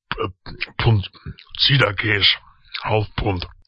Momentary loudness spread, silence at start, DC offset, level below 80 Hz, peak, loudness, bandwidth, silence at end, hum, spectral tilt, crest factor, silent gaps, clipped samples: 17 LU; 0.1 s; under 0.1%; -38 dBFS; -2 dBFS; -19 LUFS; 8 kHz; 0.2 s; none; -6.5 dB/octave; 18 dB; none; under 0.1%